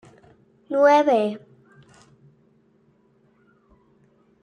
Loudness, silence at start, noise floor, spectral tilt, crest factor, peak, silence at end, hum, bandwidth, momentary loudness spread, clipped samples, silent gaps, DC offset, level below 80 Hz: -19 LUFS; 0.7 s; -61 dBFS; -5.5 dB/octave; 20 dB; -6 dBFS; 3.05 s; none; 9.6 kHz; 13 LU; under 0.1%; none; under 0.1%; -72 dBFS